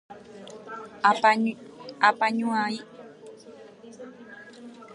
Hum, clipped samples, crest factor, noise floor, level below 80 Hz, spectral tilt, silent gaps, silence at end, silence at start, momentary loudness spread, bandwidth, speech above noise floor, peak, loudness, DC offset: none; under 0.1%; 24 dB; -47 dBFS; -78 dBFS; -4.5 dB/octave; none; 0 s; 0.1 s; 25 LU; 11 kHz; 23 dB; -4 dBFS; -24 LUFS; under 0.1%